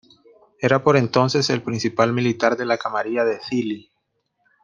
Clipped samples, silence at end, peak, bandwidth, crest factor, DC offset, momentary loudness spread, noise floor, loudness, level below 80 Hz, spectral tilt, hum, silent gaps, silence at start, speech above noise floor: under 0.1%; 0.85 s; -2 dBFS; 9.8 kHz; 20 dB; under 0.1%; 8 LU; -72 dBFS; -20 LUFS; -62 dBFS; -5.5 dB/octave; none; none; 0.6 s; 53 dB